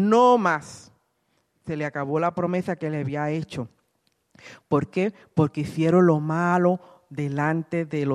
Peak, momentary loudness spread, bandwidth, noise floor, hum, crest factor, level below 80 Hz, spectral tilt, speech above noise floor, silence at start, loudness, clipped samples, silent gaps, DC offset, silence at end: -6 dBFS; 15 LU; 11 kHz; -70 dBFS; none; 18 dB; -64 dBFS; -7.5 dB/octave; 48 dB; 0 s; -24 LUFS; under 0.1%; none; under 0.1%; 0 s